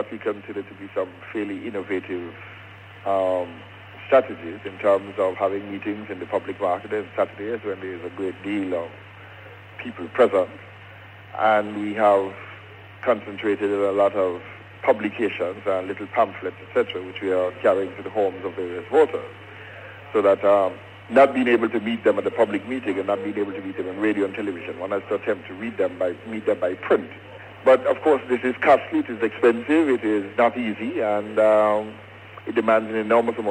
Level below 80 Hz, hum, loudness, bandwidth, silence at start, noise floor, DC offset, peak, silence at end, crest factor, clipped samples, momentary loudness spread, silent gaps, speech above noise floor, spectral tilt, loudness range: -68 dBFS; none; -23 LUFS; 9.2 kHz; 0 s; -43 dBFS; under 0.1%; -4 dBFS; 0 s; 18 dB; under 0.1%; 20 LU; none; 21 dB; -6.5 dB/octave; 7 LU